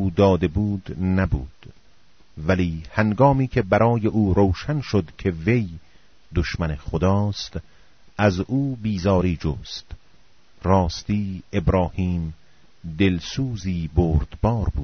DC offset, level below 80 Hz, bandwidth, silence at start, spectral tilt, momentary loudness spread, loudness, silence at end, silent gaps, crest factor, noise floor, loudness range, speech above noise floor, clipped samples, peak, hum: 0.4%; -34 dBFS; 6.6 kHz; 0 s; -6.5 dB/octave; 12 LU; -22 LUFS; 0 s; none; 18 dB; -58 dBFS; 4 LU; 36 dB; under 0.1%; -4 dBFS; none